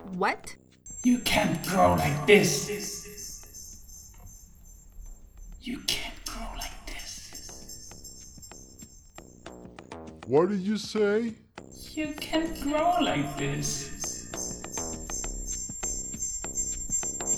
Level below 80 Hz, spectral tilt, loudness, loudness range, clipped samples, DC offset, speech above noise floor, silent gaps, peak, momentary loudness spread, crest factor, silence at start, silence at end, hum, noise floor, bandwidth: -46 dBFS; -3.5 dB/octave; -28 LUFS; 15 LU; under 0.1%; under 0.1%; 25 dB; none; -4 dBFS; 23 LU; 26 dB; 0 s; 0 s; none; -50 dBFS; over 20 kHz